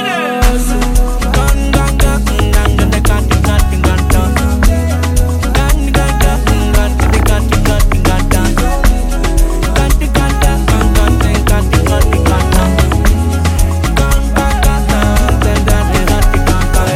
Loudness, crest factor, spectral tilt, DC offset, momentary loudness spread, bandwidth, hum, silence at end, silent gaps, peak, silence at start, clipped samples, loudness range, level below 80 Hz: -12 LUFS; 10 dB; -5.5 dB/octave; under 0.1%; 2 LU; 16 kHz; none; 0 s; none; 0 dBFS; 0 s; under 0.1%; 1 LU; -12 dBFS